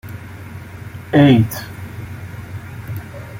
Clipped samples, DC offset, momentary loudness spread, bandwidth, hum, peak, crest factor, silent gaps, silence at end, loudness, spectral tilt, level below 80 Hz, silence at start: under 0.1%; under 0.1%; 22 LU; 17 kHz; none; -2 dBFS; 18 dB; none; 0 s; -14 LUFS; -7 dB/octave; -46 dBFS; 0.05 s